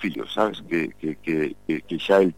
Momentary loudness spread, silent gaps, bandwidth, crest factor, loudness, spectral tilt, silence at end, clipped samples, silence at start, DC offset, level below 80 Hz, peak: 9 LU; none; 16 kHz; 18 dB; -25 LUFS; -6.5 dB/octave; 0.05 s; under 0.1%; 0 s; 0.4%; -58 dBFS; -6 dBFS